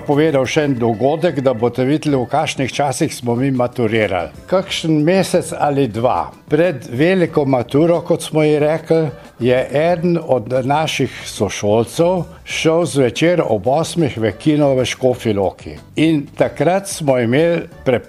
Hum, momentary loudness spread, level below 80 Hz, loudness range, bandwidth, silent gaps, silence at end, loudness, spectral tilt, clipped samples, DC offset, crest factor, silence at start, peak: none; 5 LU; -48 dBFS; 1 LU; 14 kHz; none; 0 s; -16 LUFS; -6 dB/octave; under 0.1%; under 0.1%; 16 dB; 0 s; 0 dBFS